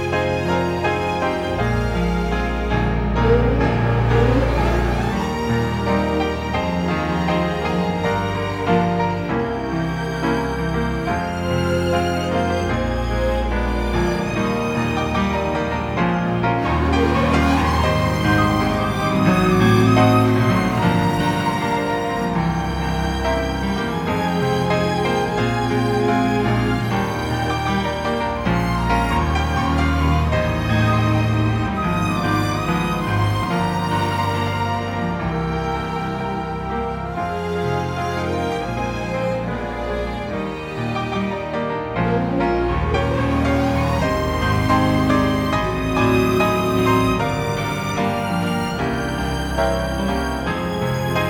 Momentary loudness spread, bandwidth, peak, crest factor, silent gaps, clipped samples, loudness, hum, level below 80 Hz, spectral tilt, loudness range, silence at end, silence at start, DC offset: 6 LU; 18.5 kHz; -2 dBFS; 16 dB; none; under 0.1%; -20 LUFS; none; -30 dBFS; -6.5 dB/octave; 6 LU; 0 s; 0 s; under 0.1%